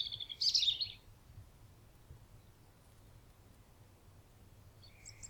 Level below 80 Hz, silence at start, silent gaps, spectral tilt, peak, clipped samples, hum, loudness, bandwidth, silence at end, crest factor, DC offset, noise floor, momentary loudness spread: -64 dBFS; 0 s; none; -0.5 dB/octave; -20 dBFS; under 0.1%; none; -33 LUFS; 19.5 kHz; 0 s; 24 dB; under 0.1%; -62 dBFS; 30 LU